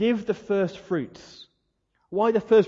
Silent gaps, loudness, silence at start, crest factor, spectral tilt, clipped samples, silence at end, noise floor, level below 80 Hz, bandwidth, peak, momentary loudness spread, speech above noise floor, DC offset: none; -25 LUFS; 0 s; 16 dB; -7 dB/octave; under 0.1%; 0 s; -73 dBFS; -64 dBFS; 7.4 kHz; -8 dBFS; 18 LU; 49 dB; under 0.1%